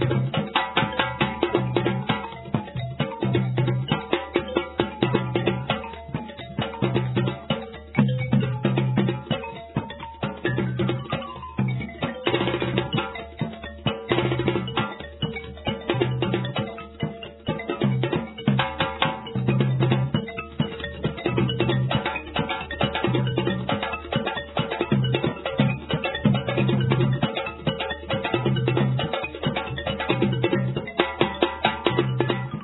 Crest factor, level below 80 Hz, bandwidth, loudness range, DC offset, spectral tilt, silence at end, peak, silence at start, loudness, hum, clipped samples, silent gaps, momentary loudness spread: 22 dB; -46 dBFS; 4.1 kHz; 3 LU; under 0.1%; -10 dB/octave; 0 s; -2 dBFS; 0 s; -25 LUFS; none; under 0.1%; none; 8 LU